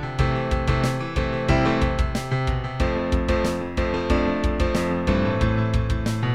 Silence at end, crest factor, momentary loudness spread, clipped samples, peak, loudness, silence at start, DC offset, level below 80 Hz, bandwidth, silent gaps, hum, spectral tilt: 0 s; 16 dB; 4 LU; under 0.1%; -6 dBFS; -23 LUFS; 0 s; 0.8%; -28 dBFS; 13.5 kHz; none; none; -6.5 dB/octave